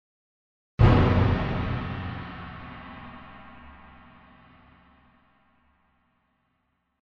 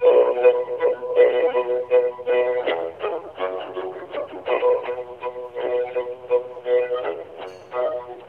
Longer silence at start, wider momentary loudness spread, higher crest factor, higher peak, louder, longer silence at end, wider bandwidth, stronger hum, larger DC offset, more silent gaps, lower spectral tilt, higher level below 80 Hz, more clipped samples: first, 0.8 s vs 0 s; first, 26 LU vs 14 LU; first, 24 dB vs 16 dB; about the same, -4 dBFS vs -4 dBFS; about the same, -24 LUFS vs -22 LUFS; first, 3.3 s vs 0 s; first, 6.2 kHz vs 4.1 kHz; neither; neither; neither; first, -9 dB/octave vs -6 dB/octave; first, -38 dBFS vs -66 dBFS; neither